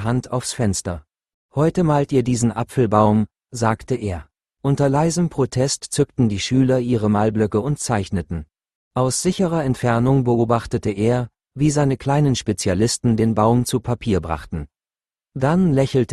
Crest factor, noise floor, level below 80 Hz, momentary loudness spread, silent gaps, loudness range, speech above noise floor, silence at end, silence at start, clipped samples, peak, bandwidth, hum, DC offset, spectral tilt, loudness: 18 dB; under -90 dBFS; -44 dBFS; 10 LU; 1.34-1.49 s, 8.75-8.91 s; 2 LU; over 71 dB; 0 s; 0 s; under 0.1%; -2 dBFS; 12.5 kHz; none; under 0.1%; -6 dB/octave; -20 LUFS